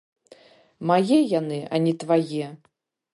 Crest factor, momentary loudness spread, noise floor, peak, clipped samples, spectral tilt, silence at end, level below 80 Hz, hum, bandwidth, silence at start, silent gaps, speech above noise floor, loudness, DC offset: 18 dB; 12 LU; -53 dBFS; -6 dBFS; under 0.1%; -7 dB/octave; 0.6 s; -74 dBFS; none; 11.5 kHz; 0.8 s; none; 30 dB; -23 LUFS; under 0.1%